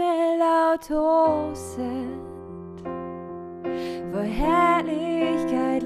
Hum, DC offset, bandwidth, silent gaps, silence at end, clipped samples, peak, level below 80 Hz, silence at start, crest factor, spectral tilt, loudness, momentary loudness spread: none; under 0.1%; 14 kHz; none; 0 s; under 0.1%; -8 dBFS; -44 dBFS; 0 s; 16 dB; -6 dB/octave; -24 LUFS; 17 LU